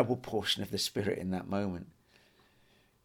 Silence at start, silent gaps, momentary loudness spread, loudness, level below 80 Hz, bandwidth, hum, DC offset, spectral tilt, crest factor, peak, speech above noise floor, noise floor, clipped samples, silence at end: 0 s; none; 8 LU; -34 LUFS; -64 dBFS; 18.5 kHz; none; under 0.1%; -4.5 dB/octave; 22 dB; -14 dBFS; 33 dB; -67 dBFS; under 0.1%; 1.15 s